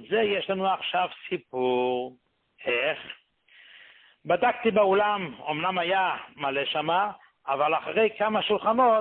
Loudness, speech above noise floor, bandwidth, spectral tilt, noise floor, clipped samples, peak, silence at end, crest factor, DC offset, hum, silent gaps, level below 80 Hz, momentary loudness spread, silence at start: -26 LUFS; 31 dB; 4.4 kHz; -9 dB/octave; -57 dBFS; under 0.1%; -10 dBFS; 0 s; 16 dB; under 0.1%; none; none; -68 dBFS; 11 LU; 0 s